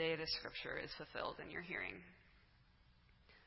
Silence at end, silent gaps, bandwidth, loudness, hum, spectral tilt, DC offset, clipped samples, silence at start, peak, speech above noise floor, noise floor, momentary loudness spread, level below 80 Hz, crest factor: 0 s; none; 5.8 kHz; -45 LUFS; none; -1.5 dB/octave; under 0.1%; under 0.1%; 0 s; -28 dBFS; 22 dB; -70 dBFS; 8 LU; -68 dBFS; 20 dB